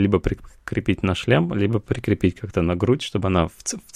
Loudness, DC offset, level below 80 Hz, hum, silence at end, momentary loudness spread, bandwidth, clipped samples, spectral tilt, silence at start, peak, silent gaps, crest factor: -22 LUFS; under 0.1%; -38 dBFS; none; 0.15 s; 8 LU; 14.5 kHz; under 0.1%; -6 dB/octave; 0 s; -4 dBFS; none; 18 dB